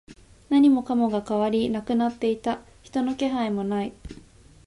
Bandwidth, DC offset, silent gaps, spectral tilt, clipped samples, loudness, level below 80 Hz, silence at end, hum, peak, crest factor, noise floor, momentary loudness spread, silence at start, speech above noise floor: 11.5 kHz; under 0.1%; none; -6.5 dB/octave; under 0.1%; -24 LUFS; -52 dBFS; 0.5 s; none; -10 dBFS; 14 dB; -50 dBFS; 13 LU; 0.1 s; 27 dB